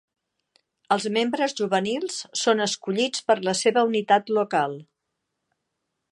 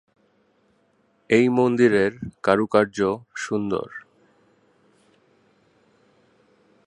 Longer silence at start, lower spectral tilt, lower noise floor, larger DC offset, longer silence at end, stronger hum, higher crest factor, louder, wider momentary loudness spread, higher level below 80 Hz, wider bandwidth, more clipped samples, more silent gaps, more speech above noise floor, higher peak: second, 0.9 s vs 1.3 s; second, -3.5 dB/octave vs -6 dB/octave; first, -80 dBFS vs -64 dBFS; neither; second, 1.3 s vs 2.9 s; neither; about the same, 20 dB vs 24 dB; about the same, -23 LUFS vs -21 LUFS; second, 6 LU vs 11 LU; second, -76 dBFS vs -60 dBFS; about the same, 11.5 kHz vs 10.5 kHz; neither; neither; first, 57 dB vs 44 dB; about the same, -4 dBFS vs -2 dBFS